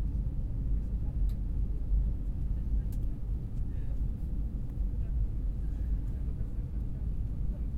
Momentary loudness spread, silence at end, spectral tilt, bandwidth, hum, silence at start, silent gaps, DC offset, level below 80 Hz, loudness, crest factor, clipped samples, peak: 4 LU; 0 s; -10 dB/octave; 1.9 kHz; none; 0 s; none; under 0.1%; -32 dBFS; -36 LUFS; 12 dB; under 0.1%; -20 dBFS